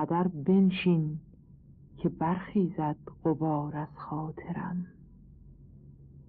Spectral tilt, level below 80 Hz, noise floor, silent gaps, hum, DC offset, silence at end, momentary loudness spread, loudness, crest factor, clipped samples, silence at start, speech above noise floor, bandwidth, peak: -7.5 dB/octave; -58 dBFS; -54 dBFS; none; none; under 0.1%; 0.05 s; 12 LU; -30 LUFS; 16 dB; under 0.1%; 0 s; 25 dB; 4.5 kHz; -16 dBFS